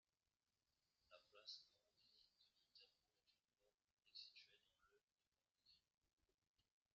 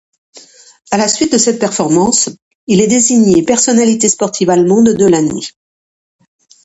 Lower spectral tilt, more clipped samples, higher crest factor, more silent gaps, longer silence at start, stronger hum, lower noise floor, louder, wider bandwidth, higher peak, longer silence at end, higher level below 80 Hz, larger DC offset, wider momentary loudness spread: second, 2 dB/octave vs -4 dB/octave; neither; first, 26 dB vs 12 dB; first, 3.93-3.97 s, 5.04-5.08 s, 5.28-5.32 s, 5.51-5.55 s, 6.13-6.17 s, 6.34-6.38 s, 6.47-6.54 s vs 2.42-2.67 s; first, 0.65 s vs 0.35 s; neither; about the same, under -90 dBFS vs under -90 dBFS; second, -62 LUFS vs -11 LUFS; second, 6.8 kHz vs 8.8 kHz; second, -46 dBFS vs 0 dBFS; second, 0.35 s vs 1.15 s; second, under -90 dBFS vs -50 dBFS; neither; second, 4 LU vs 9 LU